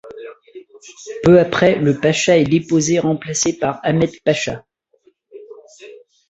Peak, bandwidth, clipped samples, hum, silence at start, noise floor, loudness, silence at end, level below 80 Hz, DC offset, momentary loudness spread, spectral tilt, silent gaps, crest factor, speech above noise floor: -2 dBFS; 8.2 kHz; under 0.1%; none; 0.05 s; -57 dBFS; -16 LUFS; 0.35 s; -50 dBFS; under 0.1%; 21 LU; -5 dB/octave; none; 16 dB; 41 dB